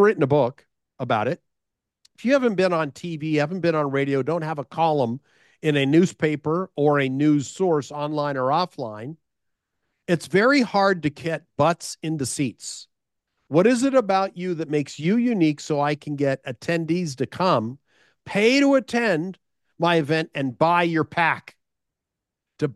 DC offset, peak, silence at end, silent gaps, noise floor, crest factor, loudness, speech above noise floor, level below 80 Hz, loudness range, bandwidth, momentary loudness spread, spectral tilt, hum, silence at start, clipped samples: under 0.1%; -6 dBFS; 0 s; none; -85 dBFS; 18 dB; -22 LUFS; 63 dB; -66 dBFS; 2 LU; 12.5 kHz; 11 LU; -6 dB/octave; none; 0 s; under 0.1%